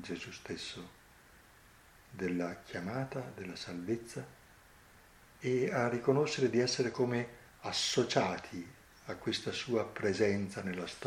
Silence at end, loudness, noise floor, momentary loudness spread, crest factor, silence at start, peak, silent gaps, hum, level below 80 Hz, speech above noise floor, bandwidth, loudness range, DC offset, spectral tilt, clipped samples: 0 s; -35 LUFS; -61 dBFS; 15 LU; 22 dB; 0 s; -14 dBFS; none; none; -68 dBFS; 26 dB; 16 kHz; 9 LU; under 0.1%; -4.5 dB/octave; under 0.1%